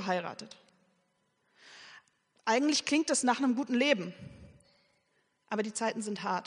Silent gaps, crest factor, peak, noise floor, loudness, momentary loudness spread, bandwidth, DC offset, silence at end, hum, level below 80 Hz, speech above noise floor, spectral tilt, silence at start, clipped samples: none; 20 dB; -12 dBFS; -75 dBFS; -30 LUFS; 23 LU; 10.5 kHz; under 0.1%; 0 s; none; -74 dBFS; 45 dB; -3 dB/octave; 0 s; under 0.1%